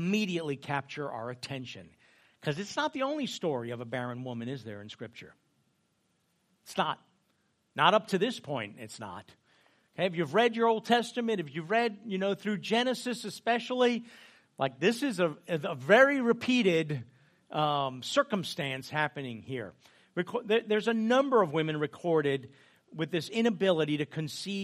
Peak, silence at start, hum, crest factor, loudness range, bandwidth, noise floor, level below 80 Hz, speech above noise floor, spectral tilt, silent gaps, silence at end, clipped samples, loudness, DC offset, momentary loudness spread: -8 dBFS; 0 s; none; 24 dB; 8 LU; 15 kHz; -74 dBFS; -78 dBFS; 44 dB; -5 dB/octave; none; 0 s; under 0.1%; -30 LUFS; under 0.1%; 15 LU